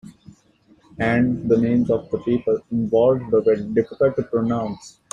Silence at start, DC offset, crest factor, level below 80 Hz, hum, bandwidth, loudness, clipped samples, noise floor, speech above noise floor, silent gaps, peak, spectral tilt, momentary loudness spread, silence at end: 0.05 s; under 0.1%; 16 dB; -52 dBFS; none; 8.6 kHz; -20 LUFS; under 0.1%; -56 dBFS; 37 dB; none; -6 dBFS; -8 dB/octave; 6 LU; 0.2 s